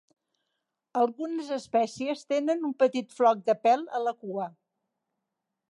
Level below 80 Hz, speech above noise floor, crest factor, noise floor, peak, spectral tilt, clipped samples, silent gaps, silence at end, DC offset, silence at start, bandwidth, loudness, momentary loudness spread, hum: -80 dBFS; 58 dB; 18 dB; -84 dBFS; -10 dBFS; -5 dB/octave; under 0.1%; none; 1.2 s; under 0.1%; 0.95 s; 11.5 kHz; -28 LUFS; 10 LU; none